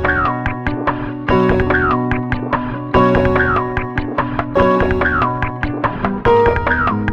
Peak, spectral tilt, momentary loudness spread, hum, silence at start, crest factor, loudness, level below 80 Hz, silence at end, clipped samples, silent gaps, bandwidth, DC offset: 0 dBFS; -8.5 dB/octave; 7 LU; none; 0 s; 16 dB; -16 LUFS; -28 dBFS; 0 s; under 0.1%; none; 7 kHz; under 0.1%